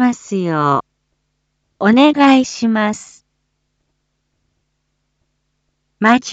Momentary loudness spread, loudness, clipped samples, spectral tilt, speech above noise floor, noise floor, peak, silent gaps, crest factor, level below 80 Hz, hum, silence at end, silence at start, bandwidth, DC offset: 10 LU; -14 LUFS; under 0.1%; -5 dB/octave; 56 dB; -69 dBFS; 0 dBFS; none; 16 dB; -62 dBFS; none; 0 s; 0 s; 8.2 kHz; under 0.1%